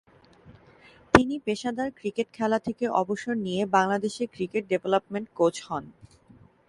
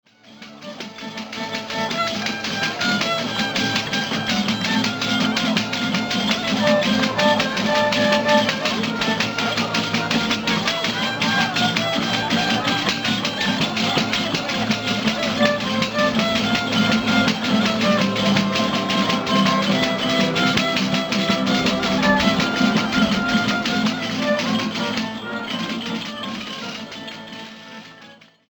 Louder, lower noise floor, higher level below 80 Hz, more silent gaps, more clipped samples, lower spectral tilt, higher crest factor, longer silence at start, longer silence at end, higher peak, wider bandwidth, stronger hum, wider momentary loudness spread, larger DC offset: second, -27 LUFS vs -20 LUFS; first, -56 dBFS vs -46 dBFS; about the same, -52 dBFS vs -50 dBFS; neither; neither; first, -5.5 dB/octave vs -4 dB/octave; first, 28 dB vs 20 dB; first, 0.45 s vs 0.25 s; first, 0.8 s vs 0.35 s; about the same, 0 dBFS vs 0 dBFS; second, 11.5 kHz vs over 20 kHz; neither; about the same, 10 LU vs 10 LU; neither